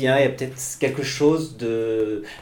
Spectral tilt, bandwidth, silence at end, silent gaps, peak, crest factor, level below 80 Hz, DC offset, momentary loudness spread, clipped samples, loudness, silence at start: -5 dB/octave; 19 kHz; 0 s; none; -6 dBFS; 16 dB; -56 dBFS; under 0.1%; 7 LU; under 0.1%; -23 LUFS; 0 s